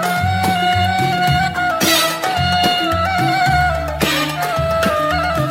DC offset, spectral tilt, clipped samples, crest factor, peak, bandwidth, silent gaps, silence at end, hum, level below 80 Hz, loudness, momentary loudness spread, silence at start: under 0.1%; -4 dB/octave; under 0.1%; 12 dB; -4 dBFS; 16.5 kHz; none; 0 s; none; -34 dBFS; -16 LUFS; 4 LU; 0 s